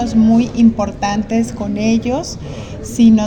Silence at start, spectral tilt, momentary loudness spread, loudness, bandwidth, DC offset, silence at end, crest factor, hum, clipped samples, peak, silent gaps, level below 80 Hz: 0 s; -6 dB/octave; 15 LU; -15 LUFS; 9.6 kHz; under 0.1%; 0 s; 12 dB; none; under 0.1%; -2 dBFS; none; -36 dBFS